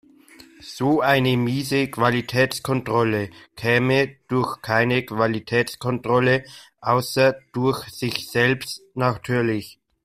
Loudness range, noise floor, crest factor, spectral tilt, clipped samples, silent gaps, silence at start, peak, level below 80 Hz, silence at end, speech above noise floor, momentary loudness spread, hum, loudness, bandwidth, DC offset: 1 LU; -49 dBFS; 18 dB; -5.5 dB/octave; under 0.1%; none; 0.65 s; -4 dBFS; -56 dBFS; 0.3 s; 27 dB; 9 LU; none; -22 LUFS; 15.5 kHz; under 0.1%